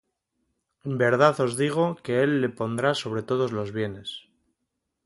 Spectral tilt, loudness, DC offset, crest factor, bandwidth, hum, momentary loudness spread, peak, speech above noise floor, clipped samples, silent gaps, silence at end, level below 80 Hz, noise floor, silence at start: -5.5 dB/octave; -25 LUFS; under 0.1%; 20 dB; 11.5 kHz; none; 14 LU; -6 dBFS; 56 dB; under 0.1%; none; 0.85 s; -64 dBFS; -80 dBFS; 0.85 s